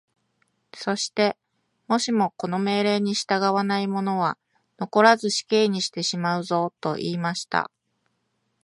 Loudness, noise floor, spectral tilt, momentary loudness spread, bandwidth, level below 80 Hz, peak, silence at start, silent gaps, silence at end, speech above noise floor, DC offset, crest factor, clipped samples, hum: -23 LUFS; -73 dBFS; -4.5 dB/octave; 8 LU; 11.5 kHz; -72 dBFS; -2 dBFS; 0.75 s; none; 1 s; 50 dB; under 0.1%; 22 dB; under 0.1%; none